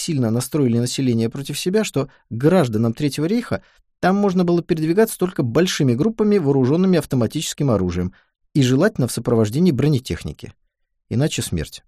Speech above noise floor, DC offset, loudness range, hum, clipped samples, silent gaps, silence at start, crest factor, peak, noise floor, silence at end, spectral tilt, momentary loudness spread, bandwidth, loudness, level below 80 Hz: 50 dB; under 0.1%; 2 LU; none; under 0.1%; none; 0 s; 16 dB; -4 dBFS; -68 dBFS; 0.1 s; -6 dB/octave; 9 LU; 15.5 kHz; -19 LUFS; -46 dBFS